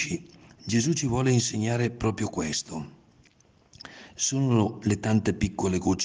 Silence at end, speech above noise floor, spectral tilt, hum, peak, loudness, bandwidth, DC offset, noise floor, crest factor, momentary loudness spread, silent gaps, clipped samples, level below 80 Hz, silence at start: 0 s; 35 dB; -5 dB/octave; none; -10 dBFS; -26 LUFS; 10 kHz; under 0.1%; -61 dBFS; 18 dB; 18 LU; none; under 0.1%; -52 dBFS; 0 s